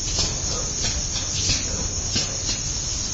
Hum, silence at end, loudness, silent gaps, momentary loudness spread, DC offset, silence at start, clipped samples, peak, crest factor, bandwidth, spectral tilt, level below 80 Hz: none; 0 s; -23 LUFS; none; 3 LU; under 0.1%; 0 s; under 0.1%; -8 dBFS; 16 dB; 8.2 kHz; -1.5 dB/octave; -32 dBFS